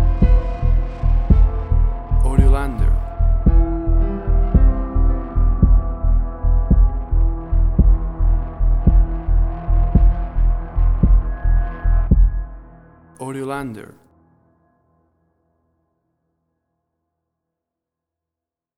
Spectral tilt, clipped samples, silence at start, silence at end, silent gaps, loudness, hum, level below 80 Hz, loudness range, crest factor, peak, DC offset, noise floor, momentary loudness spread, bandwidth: -9.5 dB/octave; under 0.1%; 0 s; 4.95 s; none; -19 LUFS; none; -16 dBFS; 11 LU; 16 dB; 0 dBFS; under 0.1%; -87 dBFS; 5 LU; 2.7 kHz